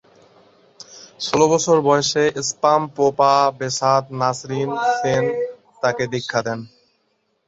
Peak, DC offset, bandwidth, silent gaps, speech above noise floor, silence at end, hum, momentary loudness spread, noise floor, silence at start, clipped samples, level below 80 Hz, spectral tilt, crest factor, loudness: -2 dBFS; under 0.1%; 8 kHz; none; 49 dB; 0.8 s; none; 11 LU; -67 dBFS; 0.9 s; under 0.1%; -60 dBFS; -4 dB/octave; 18 dB; -19 LUFS